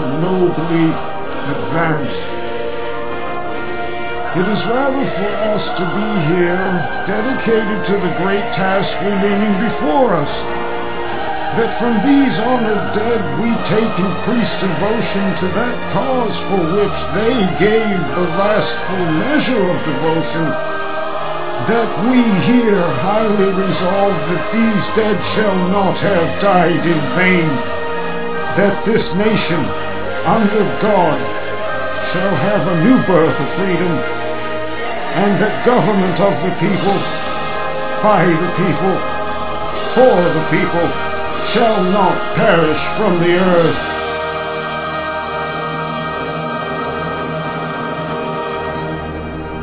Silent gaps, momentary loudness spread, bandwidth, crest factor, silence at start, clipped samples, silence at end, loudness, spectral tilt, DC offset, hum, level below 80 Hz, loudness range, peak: none; 9 LU; 4 kHz; 16 dB; 0 s; under 0.1%; 0 s; -16 LUFS; -10.5 dB/octave; 8%; none; -40 dBFS; 5 LU; 0 dBFS